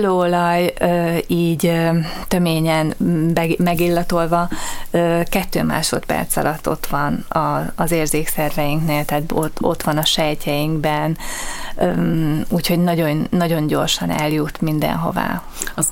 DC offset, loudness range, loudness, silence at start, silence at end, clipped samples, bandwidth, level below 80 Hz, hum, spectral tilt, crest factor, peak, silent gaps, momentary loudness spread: under 0.1%; 2 LU; -19 LUFS; 0 s; 0 s; under 0.1%; 17 kHz; -34 dBFS; none; -5 dB/octave; 16 dB; -2 dBFS; none; 5 LU